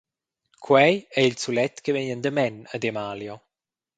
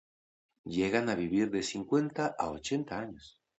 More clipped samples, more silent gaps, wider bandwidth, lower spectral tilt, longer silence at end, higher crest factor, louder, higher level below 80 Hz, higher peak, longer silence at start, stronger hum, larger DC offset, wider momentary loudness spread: neither; neither; first, 9.4 kHz vs 8.4 kHz; about the same, -5 dB/octave vs -5 dB/octave; first, 0.6 s vs 0.3 s; about the same, 22 dB vs 20 dB; first, -23 LUFS vs -32 LUFS; second, -68 dBFS vs -62 dBFS; first, -2 dBFS vs -12 dBFS; about the same, 0.6 s vs 0.65 s; neither; neither; first, 14 LU vs 11 LU